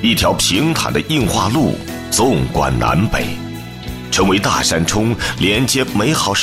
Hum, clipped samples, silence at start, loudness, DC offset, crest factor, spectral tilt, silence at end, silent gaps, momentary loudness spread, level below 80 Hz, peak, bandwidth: none; under 0.1%; 0 s; -15 LUFS; under 0.1%; 12 dB; -4 dB/octave; 0 s; none; 10 LU; -32 dBFS; -4 dBFS; 16 kHz